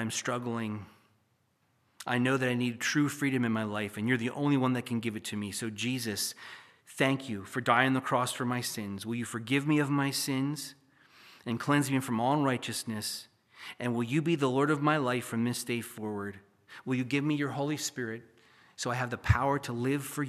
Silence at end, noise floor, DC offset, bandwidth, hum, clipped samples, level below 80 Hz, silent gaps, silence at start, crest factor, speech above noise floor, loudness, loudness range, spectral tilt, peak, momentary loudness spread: 0 s; -73 dBFS; under 0.1%; 15 kHz; none; under 0.1%; -56 dBFS; none; 0 s; 24 dB; 42 dB; -31 LUFS; 3 LU; -5 dB/octave; -8 dBFS; 11 LU